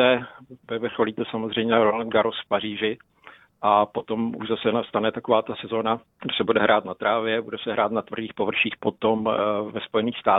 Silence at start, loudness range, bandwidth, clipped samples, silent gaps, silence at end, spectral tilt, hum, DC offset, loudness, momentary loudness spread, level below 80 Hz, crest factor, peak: 0 s; 1 LU; 4 kHz; under 0.1%; none; 0 s; -8.5 dB/octave; none; under 0.1%; -24 LUFS; 8 LU; -62 dBFS; 20 dB; -4 dBFS